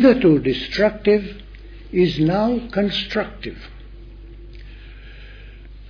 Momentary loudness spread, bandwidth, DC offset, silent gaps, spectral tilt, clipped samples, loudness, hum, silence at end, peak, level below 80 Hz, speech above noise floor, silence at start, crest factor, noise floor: 25 LU; 5.4 kHz; under 0.1%; none; -7.5 dB/octave; under 0.1%; -19 LUFS; none; 0 s; -2 dBFS; -38 dBFS; 20 dB; 0 s; 18 dB; -38 dBFS